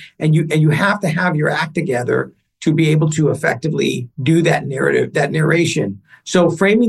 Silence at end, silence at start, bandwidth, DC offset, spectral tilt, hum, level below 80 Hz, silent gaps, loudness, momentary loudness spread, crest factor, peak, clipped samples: 0 s; 0 s; 12.5 kHz; under 0.1%; -6 dB/octave; none; -56 dBFS; none; -16 LUFS; 6 LU; 14 dB; -2 dBFS; under 0.1%